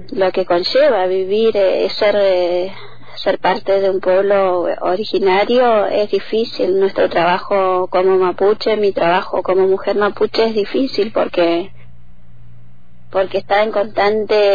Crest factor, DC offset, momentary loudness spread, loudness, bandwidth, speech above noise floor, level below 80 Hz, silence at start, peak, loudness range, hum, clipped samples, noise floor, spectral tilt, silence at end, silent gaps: 12 dB; 4%; 5 LU; -15 LUFS; 5 kHz; 31 dB; -50 dBFS; 0 s; -4 dBFS; 4 LU; none; under 0.1%; -46 dBFS; -6.5 dB/octave; 0 s; none